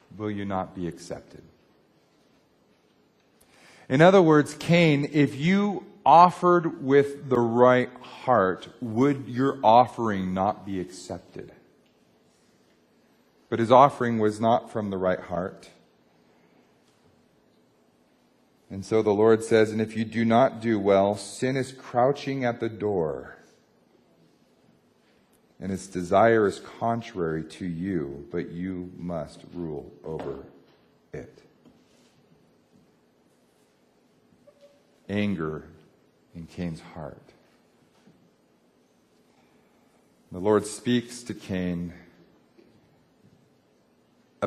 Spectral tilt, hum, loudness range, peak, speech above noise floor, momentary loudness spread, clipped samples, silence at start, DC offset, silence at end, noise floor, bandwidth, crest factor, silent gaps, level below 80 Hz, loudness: -6.5 dB/octave; none; 17 LU; -2 dBFS; 40 dB; 20 LU; under 0.1%; 0.15 s; under 0.1%; 0 s; -63 dBFS; 12.5 kHz; 24 dB; none; -58 dBFS; -24 LUFS